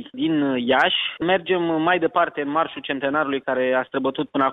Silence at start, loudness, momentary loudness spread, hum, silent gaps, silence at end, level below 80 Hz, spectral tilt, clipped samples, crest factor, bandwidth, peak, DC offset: 0 s; -21 LUFS; 6 LU; none; none; 0 s; -62 dBFS; -7 dB/octave; under 0.1%; 16 dB; 6.2 kHz; -6 dBFS; under 0.1%